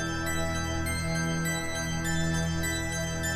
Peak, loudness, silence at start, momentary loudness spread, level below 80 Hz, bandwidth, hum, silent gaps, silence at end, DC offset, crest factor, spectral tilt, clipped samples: -16 dBFS; -30 LUFS; 0 s; 2 LU; -40 dBFS; 15.5 kHz; none; none; 0 s; under 0.1%; 14 dB; -4 dB/octave; under 0.1%